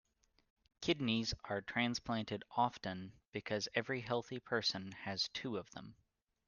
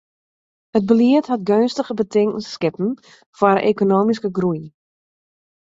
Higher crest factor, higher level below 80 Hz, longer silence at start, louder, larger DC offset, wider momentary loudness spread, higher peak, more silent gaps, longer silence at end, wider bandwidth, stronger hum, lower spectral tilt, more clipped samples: first, 24 dB vs 18 dB; about the same, -66 dBFS vs -62 dBFS; about the same, 0.8 s vs 0.75 s; second, -39 LUFS vs -18 LUFS; neither; about the same, 10 LU vs 9 LU; second, -18 dBFS vs -2 dBFS; about the same, 3.27-3.32 s vs 3.26-3.33 s; second, 0.55 s vs 1 s; first, 10 kHz vs 7.8 kHz; neither; second, -4.5 dB/octave vs -7 dB/octave; neither